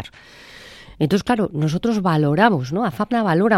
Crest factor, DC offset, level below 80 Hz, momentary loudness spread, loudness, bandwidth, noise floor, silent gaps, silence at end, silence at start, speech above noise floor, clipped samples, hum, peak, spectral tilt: 18 dB; under 0.1%; -50 dBFS; 22 LU; -19 LUFS; 13.5 kHz; -44 dBFS; none; 0 s; 0 s; 26 dB; under 0.1%; none; 0 dBFS; -7 dB/octave